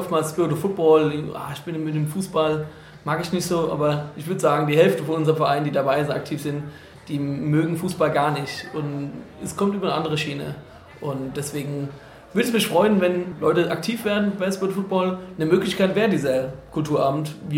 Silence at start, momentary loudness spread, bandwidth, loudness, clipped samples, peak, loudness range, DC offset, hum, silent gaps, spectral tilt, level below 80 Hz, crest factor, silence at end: 0 s; 13 LU; 16.5 kHz; -23 LUFS; under 0.1%; -4 dBFS; 5 LU; under 0.1%; none; none; -6 dB/octave; -56 dBFS; 18 dB; 0 s